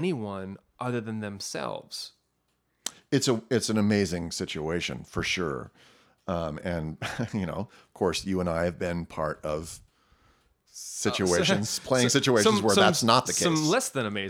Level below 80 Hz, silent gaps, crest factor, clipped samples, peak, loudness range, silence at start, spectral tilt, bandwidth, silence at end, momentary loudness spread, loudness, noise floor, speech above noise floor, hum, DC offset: -54 dBFS; none; 24 dB; under 0.1%; -4 dBFS; 9 LU; 0 s; -4 dB/octave; 17.5 kHz; 0 s; 16 LU; -27 LUFS; -74 dBFS; 47 dB; none; under 0.1%